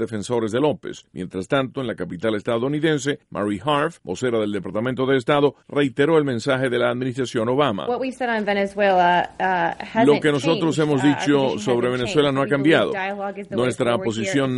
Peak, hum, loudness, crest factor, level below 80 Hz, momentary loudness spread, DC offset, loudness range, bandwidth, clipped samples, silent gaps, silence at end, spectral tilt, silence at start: -4 dBFS; none; -21 LUFS; 16 dB; -56 dBFS; 8 LU; under 0.1%; 4 LU; 11.5 kHz; under 0.1%; none; 0 s; -5.5 dB/octave; 0 s